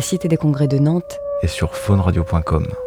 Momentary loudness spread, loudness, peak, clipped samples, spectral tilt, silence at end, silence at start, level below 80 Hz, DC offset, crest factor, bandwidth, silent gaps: 6 LU; -18 LUFS; -4 dBFS; under 0.1%; -7 dB/octave; 0 s; 0 s; -30 dBFS; under 0.1%; 14 dB; 18 kHz; none